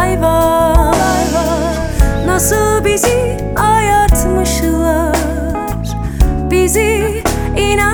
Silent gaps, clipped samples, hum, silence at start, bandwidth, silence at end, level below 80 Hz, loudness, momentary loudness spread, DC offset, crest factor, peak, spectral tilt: none; under 0.1%; none; 0 s; over 20 kHz; 0 s; -18 dBFS; -13 LUFS; 6 LU; under 0.1%; 12 dB; 0 dBFS; -5 dB/octave